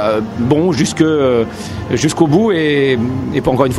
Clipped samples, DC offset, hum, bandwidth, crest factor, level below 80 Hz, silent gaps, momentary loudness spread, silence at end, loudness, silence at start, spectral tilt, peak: under 0.1%; under 0.1%; none; 13 kHz; 14 dB; -40 dBFS; none; 5 LU; 0 s; -14 LUFS; 0 s; -6 dB/octave; 0 dBFS